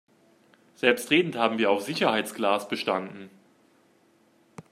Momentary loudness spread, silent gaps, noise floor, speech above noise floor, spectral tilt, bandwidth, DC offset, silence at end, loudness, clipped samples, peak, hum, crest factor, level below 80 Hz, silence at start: 7 LU; none; -63 dBFS; 37 dB; -4 dB/octave; 15 kHz; under 0.1%; 0.1 s; -25 LUFS; under 0.1%; -4 dBFS; none; 24 dB; -74 dBFS; 0.85 s